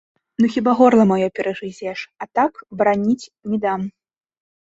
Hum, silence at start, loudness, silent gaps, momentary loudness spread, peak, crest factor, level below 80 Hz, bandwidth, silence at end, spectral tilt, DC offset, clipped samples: none; 0.4 s; -19 LUFS; none; 15 LU; -2 dBFS; 18 dB; -60 dBFS; 8 kHz; 0.85 s; -7 dB/octave; under 0.1%; under 0.1%